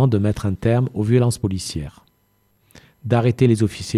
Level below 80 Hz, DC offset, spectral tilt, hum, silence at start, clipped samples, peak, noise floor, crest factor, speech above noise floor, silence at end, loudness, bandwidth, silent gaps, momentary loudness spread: -44 dBFS; under 0.1%; -7 dB/octave; none; 0 s; under 0.1%; -4 dBFS; -63 dBFS; 16 dB; 45 dB; 0 s; -20 LUFS; 13 kHz; none; 12 LU